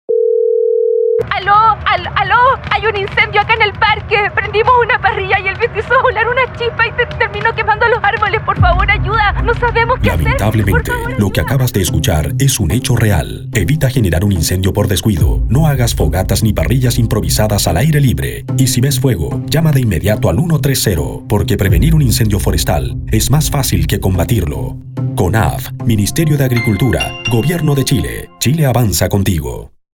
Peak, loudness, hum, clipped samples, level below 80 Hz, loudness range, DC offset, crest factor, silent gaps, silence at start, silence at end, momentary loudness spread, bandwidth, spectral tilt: 0 dBFS; -13 LUFS; none; under 0.1%; -24 dBFS; 3 LU; under 0.1%; 12 dB; none; 0.1 s; 0.25 s; 5 LU; 19.5 kHz; -5 dB/octave